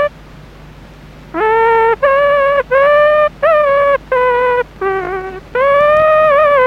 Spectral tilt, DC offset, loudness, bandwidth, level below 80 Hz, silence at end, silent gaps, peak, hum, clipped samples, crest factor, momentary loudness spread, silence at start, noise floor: -5.5 dB/octave; under 0.1%; -11 LUFS; 6.2 kHz; -40 dBFS; 0 s; none; 0 dBFS; none; under 0.1%; 12 dB; 10 LU; 0 s; -36 dBFS